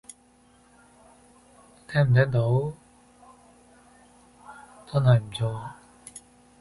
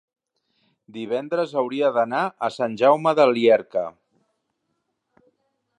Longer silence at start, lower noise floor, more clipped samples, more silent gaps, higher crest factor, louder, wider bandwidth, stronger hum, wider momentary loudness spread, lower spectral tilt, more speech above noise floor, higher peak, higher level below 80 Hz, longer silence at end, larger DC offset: first, 1.9 s vs 0.95 s; second, -59 dBFS vs -75 dBFS; neither; neither; about the same, 20 dB vs 18 dB; second, -24 LUFS vs -21 LUFS; first, 11.5 kHz vs 9.8 kHz; neither; first, 26 LU vs 11 LU; about the same, -7 dB/octave vs -6 dB/octave; second, 36 dB vs 55 dB; about the same, -8 dBFS vs -6 dBFS; first, -56 dBFS vs -76 dBFS; second, 0.45 s vs 1.9 s; neither